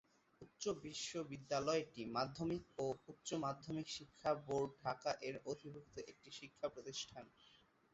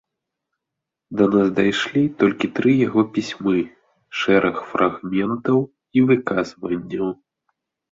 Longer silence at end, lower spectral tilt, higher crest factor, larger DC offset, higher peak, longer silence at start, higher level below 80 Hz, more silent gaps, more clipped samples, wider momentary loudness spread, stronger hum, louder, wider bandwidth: second, 0.4 s vs 0.75 s; second, -4 dB/octave vs -6.5 dB/octave; about the same, 20 dB vs 18 dB; neither; second, -26 dBFS vs -2 dBFS; second, 0.4 s vs 1.1 s; second, -74 dBFS vs -58 dBFS; neither; neither; first, 14 LU vs 9 LU; neither; second, -45 LUFS vs -20 LUFS; about the same, 8 kHz vs 7.8 kHz